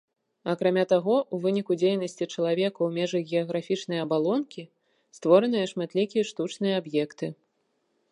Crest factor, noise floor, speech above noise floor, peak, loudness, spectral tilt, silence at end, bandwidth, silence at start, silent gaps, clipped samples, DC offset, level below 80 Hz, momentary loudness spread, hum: 20 dB; -74 dBFS; 48 dB; -6 dBFS; -26 LUFS; -6 dB/octave; 0.8 s; 11 kHz; 0.45 s; none; under 0.1%; under 0.1%; -80 dBFS; 10 LU; none